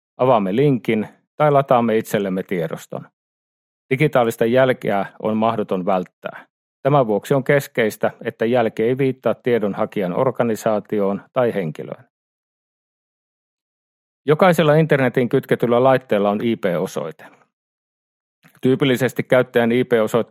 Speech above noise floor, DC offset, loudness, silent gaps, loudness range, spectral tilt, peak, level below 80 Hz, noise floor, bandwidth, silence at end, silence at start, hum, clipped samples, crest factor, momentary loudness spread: over 72 dB; under 0.1%; -19 LUFS; 1.27-1.38 s, 3.13-3.89 s, 6.13-6.22 s, 6.50-6.83 s, 12.10-14.24 s, 17.53-18.42 s; 5 LU; -7 dB/octave; 0 dBFS; -64 dBFS; under -90 dBFS; 16 kHz; 0.05 s; 0.2 s; none; under 0.1%; 18 dB; 10 LU